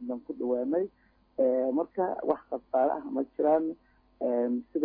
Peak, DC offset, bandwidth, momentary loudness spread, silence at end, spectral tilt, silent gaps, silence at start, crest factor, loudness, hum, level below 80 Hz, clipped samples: -12 dBFS; under 0.1%; 4.4 kHz; 10 LU; 0 s; -11 dB/octave; none; 0 s; 18 dB; -30 LUFS; none; -68 dBFS; under 0.1%